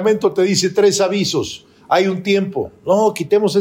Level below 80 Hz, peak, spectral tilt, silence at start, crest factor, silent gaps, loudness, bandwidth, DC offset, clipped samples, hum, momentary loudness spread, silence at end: -60 dBFS; -2 dBFS; -4.5 dB/octave; 0 s; 14 dB; none; -16 LUFS; 16 kHz; under 0.1%; under 0.1%; none; 9 LU; 0 s